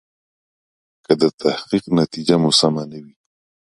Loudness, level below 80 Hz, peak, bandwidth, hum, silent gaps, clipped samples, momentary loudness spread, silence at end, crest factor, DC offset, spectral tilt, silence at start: -18 LUFS; -58 dBFS; 0 dBFS; 11.5 kHz; none; 1.34-1.38 s; under 0.1%; 12 LU; 0.75 s; 20 dB; under 0.1%; -5 dB/octave; 1.1 s